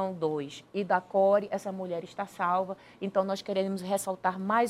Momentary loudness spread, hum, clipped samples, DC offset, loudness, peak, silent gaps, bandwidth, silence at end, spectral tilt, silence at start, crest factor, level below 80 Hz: 11 LU; none; under 0.1%; under 0.1%; -30 LUFS; -12 dBFS; none; 15 kHz; 0 s; -5.5 dB/octave; 0 s; 18 dB; -74 dBFS